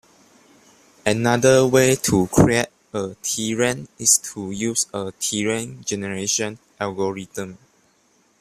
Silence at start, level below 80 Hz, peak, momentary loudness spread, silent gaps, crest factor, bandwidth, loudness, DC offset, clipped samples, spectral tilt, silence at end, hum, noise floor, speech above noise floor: 1.05 s; -48 dBFS; -2 dBFS; 13 LU; none; 20 dB; 15.5 kHz; -20 LUFS; under 0.1%; under 0.1%; -4 dB/octave; 0.85 s; none; -61 dBFS; 40 dB